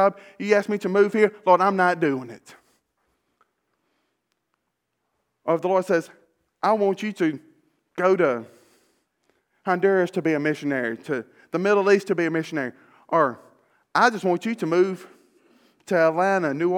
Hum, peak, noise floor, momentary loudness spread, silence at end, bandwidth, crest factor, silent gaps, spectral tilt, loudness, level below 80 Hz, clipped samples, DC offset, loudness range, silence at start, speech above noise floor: none; -2 dBFS; -78 dBFS; 12 LU; 0 s; 13.5 kHz; 22 dB; none; -6 dB/octave; -22 LUFS; -80 dBFS; under 0.1%; under 0.1%; 6 LU; 0 s; 56 dB